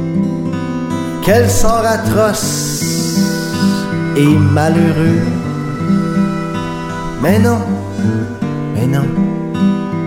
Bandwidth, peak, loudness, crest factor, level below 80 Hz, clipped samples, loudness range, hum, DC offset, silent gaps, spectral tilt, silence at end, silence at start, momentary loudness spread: 16.5 kHz; 0 dBFS; -14 LUFS; 14 dB; -30 dBFS; under 0.1%; 3 LU; none; under 0.1%; none; -6 dB/octave; 0 s; 0 s; 8 LU